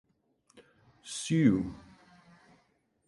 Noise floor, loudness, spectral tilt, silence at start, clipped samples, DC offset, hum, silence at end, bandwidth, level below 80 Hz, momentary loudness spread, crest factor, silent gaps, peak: -72 dBFS; -30 LUFS; -6 dB/octave; 0.55 s; under 0.1%; under 0.1%; none; 1.3 s; 11.5 kHz; -60 dBFS; 26 LU; 22 dB; none; -12 dBFS